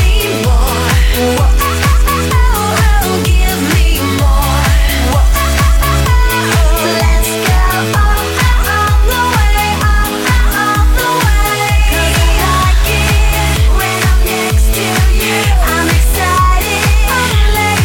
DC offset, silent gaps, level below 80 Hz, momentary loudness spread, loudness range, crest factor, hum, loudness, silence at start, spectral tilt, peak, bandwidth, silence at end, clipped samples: under 0.1%; none; -12 dBFS; 1 LU; 0 LU; 8 dB; none; -11 LUFS; 0 s; -4 dB/octave; -2 dBFS; 18 kHz; 0 s; under 0.1%